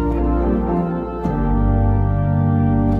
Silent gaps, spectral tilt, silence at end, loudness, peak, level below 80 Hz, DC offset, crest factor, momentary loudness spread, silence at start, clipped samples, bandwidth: none; -11.5 dB/octave; 0 s; -19 LUFS; -6 dBFS; -22 dBFS; under 0.1%; 12 dB; 5 LU; 0 s; under 0.1%; 4.1 kHz